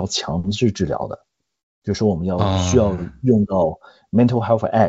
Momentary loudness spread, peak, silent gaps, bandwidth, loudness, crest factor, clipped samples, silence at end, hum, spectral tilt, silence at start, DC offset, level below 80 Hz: 10 LU; -2 dBFS; 1.63-1.82 s; 8 kHz; -19 LUFS; 18 dB; under 0.1%; 0 s; none; -6.5 dB/octave; 0 s; under 0.1%; -46 dBFS